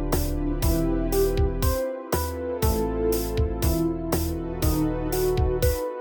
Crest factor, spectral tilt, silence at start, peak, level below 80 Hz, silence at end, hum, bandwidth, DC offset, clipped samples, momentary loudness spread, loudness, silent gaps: 16 dB; -6 dB/octave; 0 s; -8 dBFS; -28 dBFS; 0 s; none; over 20 kHz; under 0.1%; under 0.1%; 4 LU; -25 LUFS; none